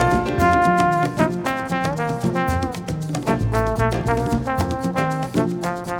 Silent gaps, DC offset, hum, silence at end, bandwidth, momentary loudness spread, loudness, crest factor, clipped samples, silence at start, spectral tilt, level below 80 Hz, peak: none; under 0.1%; none; 0 s; 18 kHz; 7 LU; -21 LUFS; 16 dB; under 0.1%; 0 s; -6.5 dB/octave; -34 dBFS; -4 dBFS